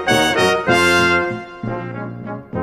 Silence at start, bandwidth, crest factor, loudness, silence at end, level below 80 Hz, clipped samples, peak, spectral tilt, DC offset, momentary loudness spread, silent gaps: 0 s; 15.5 kHz; 16 dB; -16 LUFS; 0 s; -46 dBFS; under 0.1%; -2 dBFS; -4 dB/octave; under 0.1%; 15 LU; none